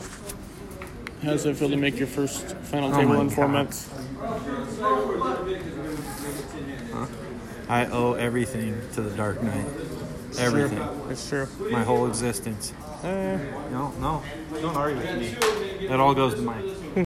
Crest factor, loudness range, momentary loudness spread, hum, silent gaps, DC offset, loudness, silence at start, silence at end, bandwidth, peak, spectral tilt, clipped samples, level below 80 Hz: 20 dB; 4 LU; 13 LU; none; none; under 0.1%; -27 LUFS; 0 s; 0 s; 16 kHz; -8 dBFS; -5.5 dB/octave; under 0.1%; -46 dBFS